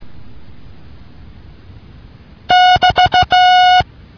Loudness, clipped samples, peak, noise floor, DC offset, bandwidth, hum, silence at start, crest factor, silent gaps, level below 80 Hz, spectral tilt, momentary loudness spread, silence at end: -10 LUFS; under 0.1%; 0 dBFS; -39 dBFS; under 0.1%; 5.4 kHz; none; 0 s; 14 dB; none; -38 dBFS; -3 dB/octave; 4 LU; 0.35 s